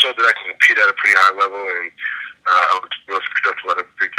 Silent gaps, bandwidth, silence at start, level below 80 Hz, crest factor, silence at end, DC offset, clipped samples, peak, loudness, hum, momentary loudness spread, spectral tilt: none; 16 kHz; 0 s; -74 dBFS; 16 dB; 0 s; under 0.1%; under 0.1%; 0 dBFS; -16 LUFS; none; 12 LU; 0.5 dB/octave